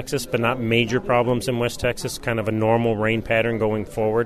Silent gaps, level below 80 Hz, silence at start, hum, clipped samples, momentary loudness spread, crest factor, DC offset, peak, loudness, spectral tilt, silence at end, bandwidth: none; -42 dBFS; 0 s; none; under 0.1%; 5 LU; 16 dB; under 0.1%; -4 dBFS; -22 LUFS; -5.5 dB/octave; 0 s; 13.5 kHz